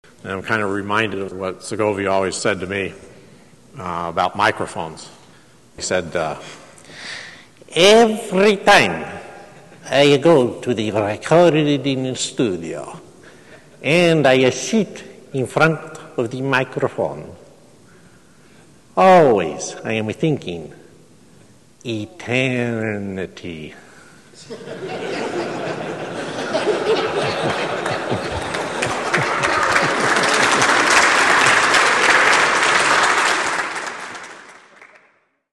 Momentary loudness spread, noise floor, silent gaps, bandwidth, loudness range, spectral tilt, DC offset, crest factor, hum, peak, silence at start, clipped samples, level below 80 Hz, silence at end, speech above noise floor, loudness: 19 LU; -59 dBFS; none; 12.5 kHz; 11 LU; -3.5 dB/octave; 0.2%; 18 dB; none; -2 dBFS; 0.25 s; under 0.1%; -54 dBFS; 0.7 s; 41 dB; -17 LUFS